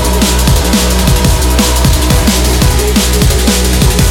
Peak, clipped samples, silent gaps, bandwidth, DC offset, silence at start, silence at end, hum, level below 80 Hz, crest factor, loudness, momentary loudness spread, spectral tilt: 0 dBFS; under 0.1%; none; 17.5 kHz; 0.3%; 0 s; 0 s; none; -12 dBFS; 8 dB; -9 LUFS; 1 LU; -4 dB/octave